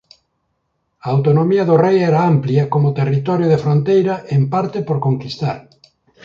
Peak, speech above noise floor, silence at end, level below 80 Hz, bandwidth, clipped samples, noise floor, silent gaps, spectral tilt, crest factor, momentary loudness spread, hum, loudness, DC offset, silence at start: -2 dBFS; 54 dB; 0.65 s; -56 dBFS; 7 kHz; under 0.1%; -69 dBFS; none; -9 dB/octave; 14 dB; 8 LU; none; -16 LUFS; under 0.1%; 1.05 s